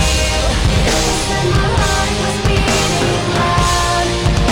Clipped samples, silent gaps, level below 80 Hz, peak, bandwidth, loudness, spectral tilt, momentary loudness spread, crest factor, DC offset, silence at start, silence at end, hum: under 0.1%; none; -20 dBFS; 0 dBFS; 17 kHz; -14 LUFS; -4 dB/octave; 2 LU; 14 dB; under 0.1%; 0 s; 0 s; none